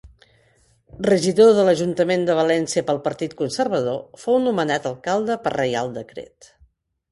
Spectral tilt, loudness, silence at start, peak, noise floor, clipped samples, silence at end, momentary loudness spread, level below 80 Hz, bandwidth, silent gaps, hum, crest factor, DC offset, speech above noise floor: -5 dB/octave; -20 LUFS; 0.05 s; -4 dBFS; -59 dBFS; under 0.1%; 0.85 s; 12 LU; -56 dBFS; 11.5 kHz; none; none; 18 dB; under 0.1%; 40 dB